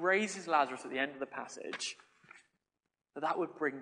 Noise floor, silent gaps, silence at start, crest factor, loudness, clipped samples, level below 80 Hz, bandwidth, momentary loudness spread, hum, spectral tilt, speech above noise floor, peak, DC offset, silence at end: -89 dBFS; none; 0 s; 22 dB; -36 LUFS; under 0.1%; -88 dBFS; 10 kHz; 12 LU; none; -3 dB/octave; 53 dB; -14 dBFS; under 0.1%; 0 s